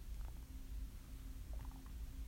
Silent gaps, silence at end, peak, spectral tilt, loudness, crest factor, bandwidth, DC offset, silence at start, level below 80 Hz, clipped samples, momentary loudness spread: none; 0 s; -36 dBFS; -5.5 dB/octave; -53 LUFS; 12 dB; 16 kHz; under 0.1%; 0 s; -48 dBFS; under 0.1%; 3 LU